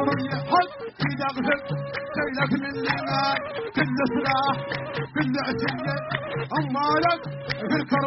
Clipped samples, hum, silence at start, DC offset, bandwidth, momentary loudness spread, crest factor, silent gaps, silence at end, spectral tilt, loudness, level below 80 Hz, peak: under 0.1%; none; 0 s; under 0.1%; 6 kHz; 7 LU; 18 dB; none; 0 s; -4 dB/octave; -25 LUFS; -56 dBFS; -8 dBFS